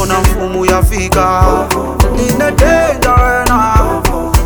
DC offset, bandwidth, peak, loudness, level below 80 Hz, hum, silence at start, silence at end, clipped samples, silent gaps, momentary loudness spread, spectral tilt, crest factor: under 0.1%; over 20 kHz; 0 dBFS; -11 LUFS; -16 dBFS; none; 0 s; 0 s; under 0.1%; none; 4 LU; -5.5 dB/octave; 10 dB